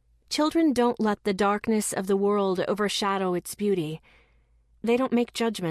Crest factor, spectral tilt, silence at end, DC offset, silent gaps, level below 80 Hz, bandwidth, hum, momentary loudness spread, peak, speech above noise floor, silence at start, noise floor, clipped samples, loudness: 14 dB; -4.5 dB/octave; 0 s; under 0.1%; none; -60 dBFS; 14 kHz; none; 6 LU; -12 dBFS; 37 dB; 0.3 s; -62 dBFS; under 0.1%; -26 LUFS